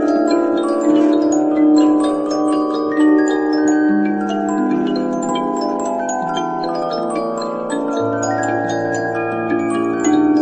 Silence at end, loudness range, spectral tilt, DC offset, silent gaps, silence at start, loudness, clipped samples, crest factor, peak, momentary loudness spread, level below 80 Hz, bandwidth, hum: 0 s; 5 LU; -5.5 dB/octave; under 0.1%; none; 0 s; -17 LUFS; under 0.1%; 12 dB; -4 dBFS; 7 LU; -56 dBFS; 8.6 kHz; none